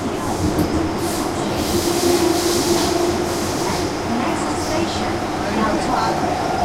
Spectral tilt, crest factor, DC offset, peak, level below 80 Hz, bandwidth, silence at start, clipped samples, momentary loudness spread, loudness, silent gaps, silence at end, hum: -4.5 dB/octave; 14 dB; under 0.1%; -6 dBFS; -38 dBFS; 16 kHz; 0 s; under 0.1%; 4 LU; -19 LUFS; none; 0 s; none